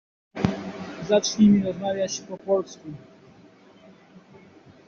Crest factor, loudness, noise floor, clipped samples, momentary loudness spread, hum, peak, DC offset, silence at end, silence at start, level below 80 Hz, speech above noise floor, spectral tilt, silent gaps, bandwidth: 22 dB; -24 LUFS; -52 dBFS; under 0.1%; 22 LU; none; -4 dBFS; under 0.1%; 1.9 s; 0.35 s; -58 dBFS; 30 dB; -6 dB/octave; none; 7.2 kHz